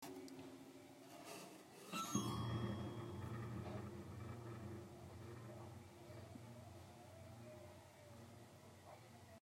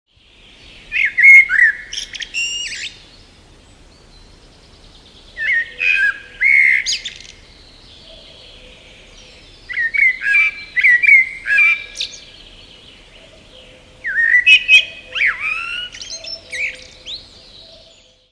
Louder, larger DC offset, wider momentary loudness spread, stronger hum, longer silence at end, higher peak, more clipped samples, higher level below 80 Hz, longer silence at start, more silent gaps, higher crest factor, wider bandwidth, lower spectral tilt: second, -52 LUFS vs -12 LUFS; neither; second, 16 LU vs 20 LU; neither; second, 0 s vs 1.1 s; second, -26 dBFS vs 0 dBFS; neither; second, -72 dBFS vs -50 dBFS; second, 0 s vs 0.9 s; neither; first, 24 dB vs 18 dB; first, 16 kHz vs 11 kHz; first, -5 dB/octave vs 1 dB/octave